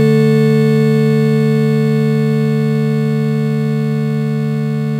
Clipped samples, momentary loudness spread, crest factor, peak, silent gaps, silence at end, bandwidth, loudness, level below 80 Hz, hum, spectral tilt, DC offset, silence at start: under 0.1%; 6 LU; 10 dB; -4 dBFS; none; 0 s; 13 kHz; -14 LUFS; -56 dBFS; none; -8.5 dB/octave; under 0.1%; 0 s